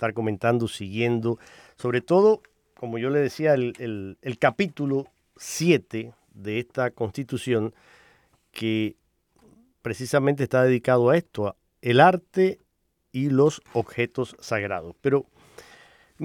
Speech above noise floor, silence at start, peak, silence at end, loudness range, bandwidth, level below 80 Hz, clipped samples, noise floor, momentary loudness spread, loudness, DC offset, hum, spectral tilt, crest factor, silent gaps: 49 dB; 0 s; -4 dBFS; 0 s; 8 LU; 18 kHz; -64 dBFS; under 0.1%; -73 dBFS; 15 LU; -24 LUFS; under 0.1%; none; -6 dB/octave; 22 dB; none